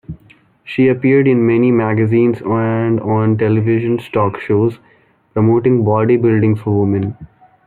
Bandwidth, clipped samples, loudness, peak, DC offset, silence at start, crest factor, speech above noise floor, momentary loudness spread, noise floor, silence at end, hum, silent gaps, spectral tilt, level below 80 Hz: 4.3 kHz; under 0.1%; -14 LUFS; -2 dBFS; under 0.1%; 0.1 s; 12 dB; 35 dB; 5 LU; -49 dBFS; 0.4 s; none; none; -10.5 dB/octave; -50 dBFS